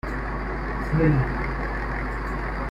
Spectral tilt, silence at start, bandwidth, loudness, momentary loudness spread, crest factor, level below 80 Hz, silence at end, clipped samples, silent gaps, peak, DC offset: -8.5 dB/octave; 0.05 s; 7.6 kHz; -26 LUFS; 9 LU; 16 dB; -30 dBFS; 0 s; under 0.1%; none; -8 dBFS; under 0.1%